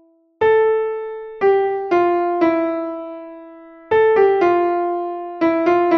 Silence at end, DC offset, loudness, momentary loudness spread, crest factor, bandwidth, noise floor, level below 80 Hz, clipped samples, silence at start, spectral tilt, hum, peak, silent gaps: 0 s; under 0.1%; -17 LUFS; 13 LU; 14 dB; 6.2 kHz; -40 dBFS; -58 dBFS; under 0.1%; 0.4 s; -7 dB/octave; none; -4 dBFS; none